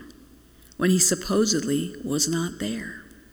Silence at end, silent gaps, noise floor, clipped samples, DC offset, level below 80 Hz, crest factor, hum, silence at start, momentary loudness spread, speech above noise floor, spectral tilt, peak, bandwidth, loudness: 0.25 s; none; -52 dBFS; under 0.1%; under 0.1%; -52 dBFS; 20 dB; none; 0 s; 13 LU; 28 dB; -3.5 dB/octave; -6 dBFS; over 20 kHz; -23 LUFS